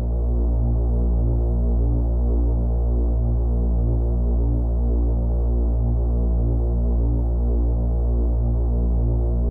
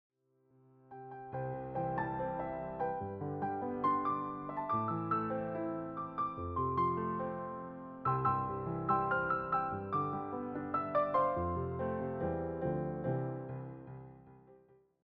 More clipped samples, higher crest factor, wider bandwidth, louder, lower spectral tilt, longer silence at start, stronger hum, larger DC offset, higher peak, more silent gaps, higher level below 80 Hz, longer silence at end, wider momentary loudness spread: neither; second, 8 dB vs 18 dB; second, 1.4 kHz vs 5.2 kHz; first, -22 LUFS vs -36 LUFS; first, -14 dB/octave vs -7.5 dB/octave; second, 0 s vs 0.9 s; neither; first, 0.2% vs under 0.1%; first, -12 dBFS vs -20 dBFS; neither; first, -20 dBFS vs -60 dBFS; second, 0 s vs 0.5 s; second, 1 LU vs 12 LU